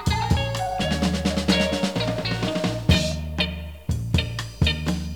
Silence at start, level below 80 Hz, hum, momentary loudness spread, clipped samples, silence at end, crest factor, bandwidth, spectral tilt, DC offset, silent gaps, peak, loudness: 0 s; -32 dBFS; none; 6 LU; under 0.1%; 0 s; 18 dB; 19 kHz; -5 dB/octave; 0.3%; none; -4 dBFS; -24 LUFS